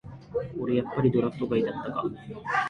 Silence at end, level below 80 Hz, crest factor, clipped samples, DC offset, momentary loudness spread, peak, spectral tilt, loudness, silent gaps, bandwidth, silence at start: 0 s; -56 dBFS; 18 dB; under 0.1%; under 0.1%; 10 LU; -10 dBFS; -8 dB/octave; -28 LUFS; none; 9.2 kHz; 0.05 s